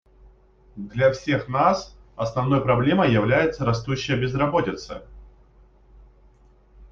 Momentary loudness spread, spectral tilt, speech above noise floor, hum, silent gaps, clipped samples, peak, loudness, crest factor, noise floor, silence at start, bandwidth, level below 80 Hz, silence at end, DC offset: 15 LU; -6.5 dB/octave; 33 dB; none; none; under 0.1%; -4 dBFS; -22 LUFS; 18 dB; -54 dBFS; 0.75 s; 7.4 kHz; -48 dBFS; 0.05 s; under 0.1%